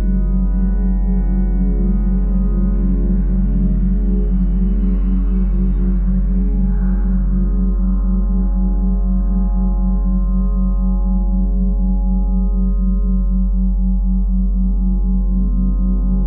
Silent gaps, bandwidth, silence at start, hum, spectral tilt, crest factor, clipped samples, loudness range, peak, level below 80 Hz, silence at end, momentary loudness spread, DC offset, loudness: none; 1.6 kHz; 0 s; none; -13 dB/octave; 8 dB; under 0.1%; 1 LU; -6 dBFS; -16 dBFS; 0 s; 1 LU; under 0.1%; -18 LUFS